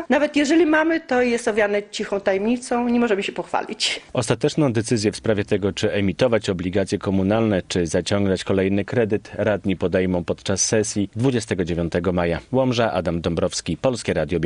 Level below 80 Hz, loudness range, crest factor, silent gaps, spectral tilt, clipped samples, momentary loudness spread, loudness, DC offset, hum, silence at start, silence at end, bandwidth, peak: -46 dBFS; 1 LU; 16 dB; none; -5 dB/octave; under 0.1%; 4 LU; -21 LUFS; under 0.1%; none; 0 s; 0 s; 11 kHz; -4 dBFS